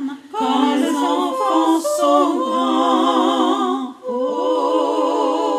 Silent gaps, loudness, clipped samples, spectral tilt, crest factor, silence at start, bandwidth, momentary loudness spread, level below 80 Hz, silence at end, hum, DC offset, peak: none; -18 LUFS; under 0.1%; -3 dB/octave; 14 dB; 0 s; 15.5 kHz; 6 LU; -78 dBFS; 0 s; none; under 0.1%; -4 dBFS